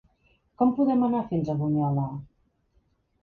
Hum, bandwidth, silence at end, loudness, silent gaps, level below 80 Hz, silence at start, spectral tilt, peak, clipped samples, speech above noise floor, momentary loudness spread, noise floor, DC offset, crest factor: none; 4.5 kHz; 1 s; -26 LUFS; none; -58 dBFS; 0.6 s; -11 dB/octave; -10 dBFS; under 0.1%; 44 dB; 8 LU; -68 dBFS; under 0.1%; 16 dB